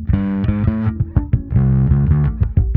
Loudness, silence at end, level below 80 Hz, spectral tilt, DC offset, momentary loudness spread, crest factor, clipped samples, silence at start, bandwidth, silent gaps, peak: -17 LUFS; 0 s; -22 dBFS; -12.5 dB/octave; under 0.1%; 4 LU; 14 dB; under 0.1%; 0 s; 3.7 kHz; none; -2 dBFS